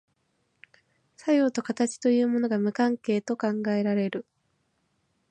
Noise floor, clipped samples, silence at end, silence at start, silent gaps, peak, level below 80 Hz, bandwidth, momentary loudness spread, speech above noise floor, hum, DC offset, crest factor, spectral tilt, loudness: -73 dBFS; under 0.1%; 1.1 s; 1.25 s; none; -12 dBFS; -78 dBFS; 9.2 kHz; 5 LU; 48 dB; none; under 0.1%; 16 dB; -6 dB/octave; -26 LUFS